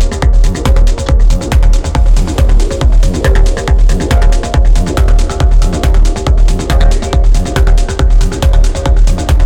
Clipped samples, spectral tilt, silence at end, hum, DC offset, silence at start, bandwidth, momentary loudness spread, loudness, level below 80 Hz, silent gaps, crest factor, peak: under 0.1%; -5.5 dB/octave; 0 s; none; under 0.1%; 0 s; 11 kHz; 1 LU; -12 LUFS; -8 dBFS; none; 6 dB; 0 dBFS